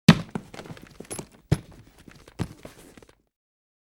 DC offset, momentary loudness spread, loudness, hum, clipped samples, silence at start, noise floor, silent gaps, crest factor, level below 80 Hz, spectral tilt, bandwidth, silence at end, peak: under 0.1%; 24 LU; -29 LUFS; none; under 0.1%; 0.1 s; -53 dBFS; none; 28 dB; -48 dBFS; -6 dB/octave; 16 kHz; 1.35 s; 0 dBFS